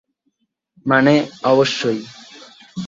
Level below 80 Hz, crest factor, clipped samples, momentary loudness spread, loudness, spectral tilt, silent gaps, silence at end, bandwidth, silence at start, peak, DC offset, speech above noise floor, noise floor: -62 dBFS; 18 dB; under 0.1%; 21 LU; -16 LUFS; -5.5 dB/octave; none; 0 s; 7.8 kHz; 0.85 s; -2 dBFS; under 0.1%; 53 dB; -69 dBFS